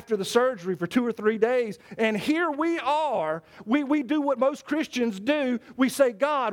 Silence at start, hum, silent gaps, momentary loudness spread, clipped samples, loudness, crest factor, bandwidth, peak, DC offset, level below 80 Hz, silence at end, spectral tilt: 0 s; none; none; 5 LU; under 0.1%; -25 LUFS; 16 dB; 18 kHz; -10 dBFS; under 0.1%; -70 dBFS; 0 s; -5 dB/octave